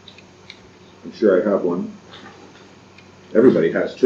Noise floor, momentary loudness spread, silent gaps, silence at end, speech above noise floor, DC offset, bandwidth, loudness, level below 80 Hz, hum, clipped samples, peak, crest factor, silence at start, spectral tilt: -46 dBFS; 25 LU; none; 0 s; 29 dB; under 0.1%; 7.4 kHz; -18 LUFS; -64 dBFS; none; under 0.1%; -2 dBFS; 18 dB; 1.05 s; -7.5 dB/octave